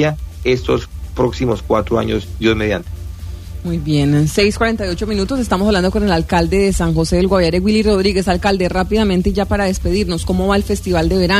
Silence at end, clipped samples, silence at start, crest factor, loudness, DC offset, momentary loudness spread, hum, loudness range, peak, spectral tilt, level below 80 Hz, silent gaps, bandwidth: 0 s; under 0.1%; 0 s; 14 dB; -16 LUFS; under 0.1%; 7 LU; none; 4 LU; -2 dBFS; -6 dB/octave; -26 dBFS; none; 15.5 kHz